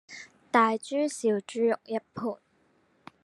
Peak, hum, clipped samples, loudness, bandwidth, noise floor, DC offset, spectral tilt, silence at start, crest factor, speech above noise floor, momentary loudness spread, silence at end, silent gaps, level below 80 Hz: -8 dBFS; none; under 0.1%; -28 LUFS; 12 kHz; -67 dBFS; under 0.1%; -4.5 dB/octave; 0.1 s; 22 dB; 40 dB; 18 LU; 0.9 s; none; -78 dBFS